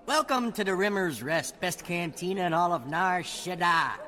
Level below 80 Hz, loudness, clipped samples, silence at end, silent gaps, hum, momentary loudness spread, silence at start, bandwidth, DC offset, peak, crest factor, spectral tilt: -62 dBFS; -28 LUFS; under 0.1%; 0 s; none; none; 7 LU; 0.05 s; 18 kHz; under 0.1%; -12 dBFS; 16 dB; -4 dB/octave